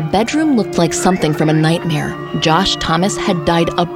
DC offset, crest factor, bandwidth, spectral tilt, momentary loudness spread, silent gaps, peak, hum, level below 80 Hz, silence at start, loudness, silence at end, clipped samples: under 0.1%; 14 dB; 16 kHz; -5 dB/octave; 4 LU; none; 0 dBFS; none; -38 dBFS; 0 s; -15 LUFS; 0 s; under 0.1%